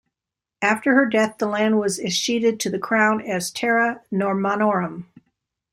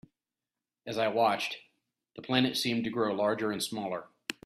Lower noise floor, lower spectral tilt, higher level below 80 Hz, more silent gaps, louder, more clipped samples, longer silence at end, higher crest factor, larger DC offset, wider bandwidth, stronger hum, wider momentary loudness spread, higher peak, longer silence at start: about the same, -87 dBFS vs under -90 dBFS; about the same, -4 dB/octave vs -4 dB/octave; first, -64 dBFS vs -72 dBFS; neither; first, -21 LUFS vs -31 LUFS; neither; first, 0.7 s vs 0.15 s; about the same, 18 dB vs 22 dB; neither; first, 16 kHz vs 14.5 kHz; neither; second, 7 LU vs 13 LU; first, -4 dBFS vs -10 dBFS; second, 0.6 s vs 0.85 s